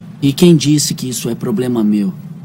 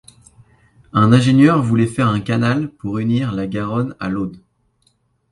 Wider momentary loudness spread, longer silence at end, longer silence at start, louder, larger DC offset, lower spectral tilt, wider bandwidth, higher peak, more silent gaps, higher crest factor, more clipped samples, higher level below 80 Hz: about the same, 10 LU vs 11 LU; second, 0 s vs 0.95 s; second, 0 s vs 0.95 s; first, -14 LUFS vs -17 LUFS; neither; second, -5.5 dB/octave vs -7.5 dB/octave; first, 16.5 kHz vs 11.5 kHz; about the same, 0 dBFS vs 0 dBFS; neither; about the same, 14 dB vs 16 dB; first, 0.4% vs under 0.1%; about the same, -50 dBFS vs -48 dBFS